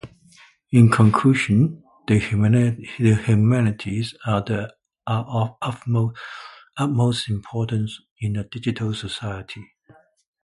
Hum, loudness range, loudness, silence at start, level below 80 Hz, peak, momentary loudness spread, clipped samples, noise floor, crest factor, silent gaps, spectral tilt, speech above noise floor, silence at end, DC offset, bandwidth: none; 7 LU; -21 LUFS; 0.05 s; -48 dBFS; -2 dBFS; 18 LU; under 0.1%; -55 dBFS; 18 dB; 8.11-8.16 s; -7 dB/octave; 35 dB; 0.8 s; under 0.1%; 11.5 kHz